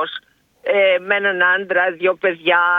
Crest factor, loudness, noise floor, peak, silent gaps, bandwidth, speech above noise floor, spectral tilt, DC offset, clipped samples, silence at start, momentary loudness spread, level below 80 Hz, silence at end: 16 dB; -16 LUFS; -41 dBFS; -2 dBFS; none; 4.5 kHz; 25 dB; -5.5 dB/octave; under 0.1%; under 0.1%; 0 s; 10 LU; -72 dBFS; 0 s